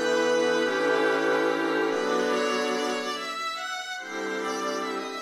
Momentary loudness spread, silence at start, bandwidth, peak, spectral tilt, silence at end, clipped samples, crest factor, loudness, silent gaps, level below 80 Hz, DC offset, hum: 8 LU; 0 s; 15.5 kHz; -12 dBFS; -2.5 dB/octave; 0 s; under 0.1%; 14 dB; -26 LUFS; none; -78 dBFS; under 0.1%; none